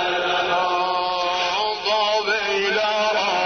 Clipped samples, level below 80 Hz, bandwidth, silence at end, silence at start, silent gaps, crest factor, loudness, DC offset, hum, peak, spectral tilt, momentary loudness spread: under 0.1%; -56 dBFS; 6.6 kHz; 0 s; 0 s; none; 12 dB; -20 LUFS; under 0.1%; none; -8 dBFS; -2 dB/octave; 2 LU